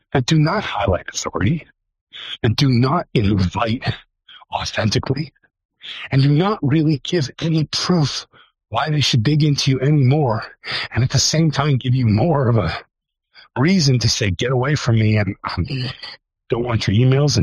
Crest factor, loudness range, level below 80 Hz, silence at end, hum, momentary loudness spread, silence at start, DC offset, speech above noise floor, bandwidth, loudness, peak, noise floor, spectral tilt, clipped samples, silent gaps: 14 dB; 3 LU; -42 dBFS; 0 s; none; 11 LU; 0.15 s; under 0.1%; 33 dB; 11.5 kHz; -18 LUFS; -4 dBFS; -51 dBFS; -5.5 dB/octave; under 0.1%; 2.01-2.07 s, 5.65-5.69 s